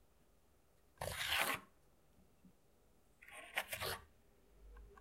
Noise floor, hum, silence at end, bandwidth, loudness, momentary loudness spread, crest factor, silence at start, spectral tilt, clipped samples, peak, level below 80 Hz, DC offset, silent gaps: -74 dBFS; none; 0 s; 16 kHz; -41 LUFS; 20 LU; 28 dB; 1 s; -1.5 dB/octave; under 0.1%; -22 dBFS; -66 dBFS; under 0.1%; none